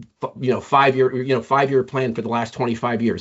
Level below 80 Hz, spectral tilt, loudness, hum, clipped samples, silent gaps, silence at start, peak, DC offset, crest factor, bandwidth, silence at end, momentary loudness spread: -62 dBFS; -5 dB/octave; -20 LUFS; none; under 0.1%; none; 0 s; -2 dBFS; under 0.1%; 18 dB; 8 kHz; 0 s; 8 LU